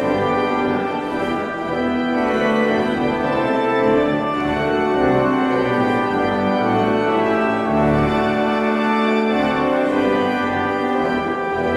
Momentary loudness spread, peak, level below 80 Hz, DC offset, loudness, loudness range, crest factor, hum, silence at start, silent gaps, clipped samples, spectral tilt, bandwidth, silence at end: 4 LU; -6 dBFS; -44 dBFS; under 0.1%; -18 LUFS; 2 LU; 12 dB; none; 0 s; none; under 0.1%; -7 dB/octave; 12.5 kHz; 0 s